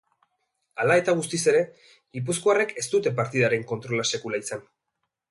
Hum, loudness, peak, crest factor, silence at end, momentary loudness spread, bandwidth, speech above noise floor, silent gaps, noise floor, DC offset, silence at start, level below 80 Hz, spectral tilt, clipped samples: none; -24 LUFS; -8 dBFS; 18 dB; 0.7 s; 13 LU; 11.5 kHz; 56 dB; none; -81 dBFS; under 0.1%; 0.75 s; -68 dBFS; -4 dB/octave; under 0.1%